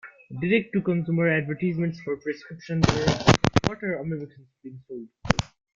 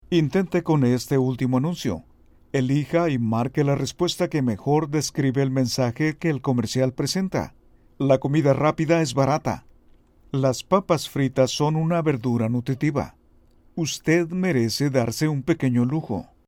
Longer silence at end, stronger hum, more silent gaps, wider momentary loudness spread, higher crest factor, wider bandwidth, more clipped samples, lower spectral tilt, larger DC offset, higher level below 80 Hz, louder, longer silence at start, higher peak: about the same, 0.3 s vs 0.25 s; neither; neither; first, 19 LU vs 7 LU; first, 26 dB vs 18 dB; second, 7.6 kHz vs 16.5 kHz; neither; about the same, -6 dB/octave vs -6 dB/octave; neither; first, -44 dBFS vs -52 dBFS; about the same, -25 LUFS vs -23 LUFS; about the same, 0.05 s vs 0.1 s; first, 0 dBFS vs -4 dBFS